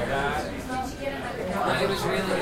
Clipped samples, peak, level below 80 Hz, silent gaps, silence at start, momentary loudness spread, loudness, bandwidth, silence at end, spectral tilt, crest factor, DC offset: under 0.1%; -12 dBFS; -44 dBFS; none; 0 s; 7 LU; -28 LUFS; 16 kHz; 0 s; -5 dB/octave; 16 dB; under 0.1%